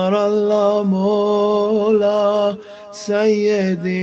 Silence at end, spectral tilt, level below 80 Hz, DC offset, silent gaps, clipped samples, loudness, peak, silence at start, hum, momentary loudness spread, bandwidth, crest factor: 0 s; -6.5 dB/octave; -60 dBFS; under 0.1%; none; under 0.1%; -17 LUFS; -4 dBFS; 0 s; none; 6 LU; 8 kHz; 12 dB